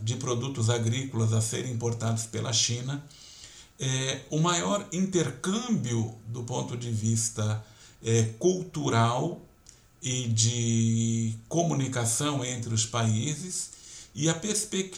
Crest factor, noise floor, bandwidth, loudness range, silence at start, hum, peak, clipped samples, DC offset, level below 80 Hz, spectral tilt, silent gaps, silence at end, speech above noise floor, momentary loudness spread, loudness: 20 dB; -56 dBFS; 14.5 kHz; 2 LU; 0 s; none; -10 dBFS; under 0.1%; under 0.1%; -62 dBFS; -4.5 dB/octave; none; 0 s; 28 dB; 11 LU; -28 LUFS